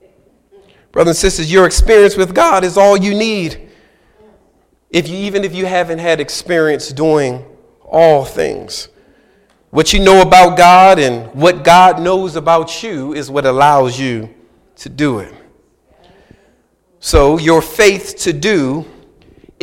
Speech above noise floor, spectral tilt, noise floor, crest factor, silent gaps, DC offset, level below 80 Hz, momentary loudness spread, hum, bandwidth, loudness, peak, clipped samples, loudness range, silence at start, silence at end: 45 dB; -4.5 dB/octave; -55 dBFS; 12 dB; none; under 0.1%; -28 dBFS; 14 LU; none; 17 kHz; -11 LUFS; 0 dBFS; under 0.1%; 9 LU; 0.95 s; 0.8 s